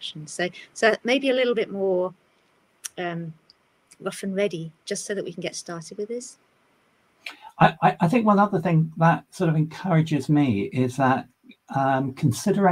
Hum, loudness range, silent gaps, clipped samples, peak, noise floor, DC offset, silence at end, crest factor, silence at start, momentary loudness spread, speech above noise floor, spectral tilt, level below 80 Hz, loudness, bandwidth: none; 10 LU; none; under 0.1%; -4 dBFS; -64 dBFS; under 0.1%; 0 s; 20 dB; 0 s; 15 LU; 41 dB; -6 dB/octave; -64 dBFS; -23 LUFS; 15 kHz